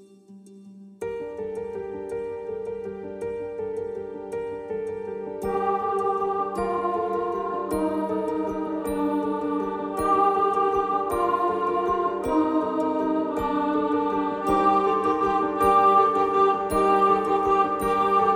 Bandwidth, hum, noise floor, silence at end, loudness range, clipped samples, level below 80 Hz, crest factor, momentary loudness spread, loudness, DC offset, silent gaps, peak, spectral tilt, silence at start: 16.5 kHz; none; -48 dBFS; 0 s; 12 LU; under 0.1%; -52 dBFS; 16 dB; 12 LU; -24 LUFS; under 0.1%; none; -8 dBFS; -6.5 dB/octave; 0 s